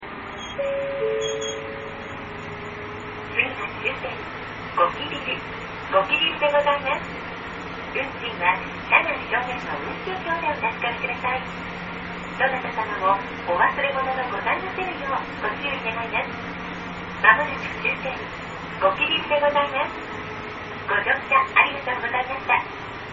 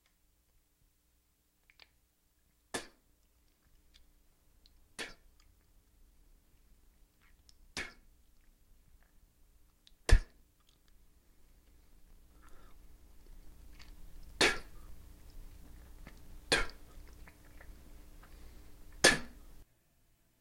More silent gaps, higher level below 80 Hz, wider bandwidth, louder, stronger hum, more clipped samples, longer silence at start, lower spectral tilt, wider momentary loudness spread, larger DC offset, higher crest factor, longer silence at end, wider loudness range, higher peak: neither; about the same, -50 dBFS vs -46 dBFS; second, 7.4 kHz vs 16.5 kHz; first, -24 LUFS vs -33 LUFS; second, none vs 60 Hz at -70 dBFS; neither; second, 0 s vs 2.75 s; second, -1 dB/octave vs -2.5 dB/octave; second, 14 LU vs 28 LU; neither; second, 24 dB vs 32 dB; second, 0 s vs 0.8 s; second, 5 LU vs 18 LU; first, 0 dBFS vs -8 dBFS